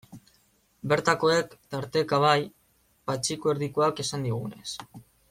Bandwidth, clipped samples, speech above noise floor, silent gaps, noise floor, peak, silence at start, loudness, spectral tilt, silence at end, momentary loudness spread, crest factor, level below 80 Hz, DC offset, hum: 16 kHz; under 0.1%; 40 dB; none; -66 dBFS; -6 dBFS; 0.1 s; -27 LUFS; -4.5 dB/octave; 0.3 s; 15 LU; 22 dB; -64 dBFS; under 0.1%; none